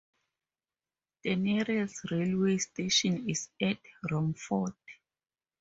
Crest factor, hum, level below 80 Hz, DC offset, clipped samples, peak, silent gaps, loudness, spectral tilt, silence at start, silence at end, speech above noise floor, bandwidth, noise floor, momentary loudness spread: 18 dB; none; -68 dBFS; under 0.1%; under 0.1%; -14 dBFS; none; -31 LUFS; -4.5 dB/octave; 1.25 s; 0.7 s; over 59 dB; 8 kHz; under -90 dBFS; 8 LU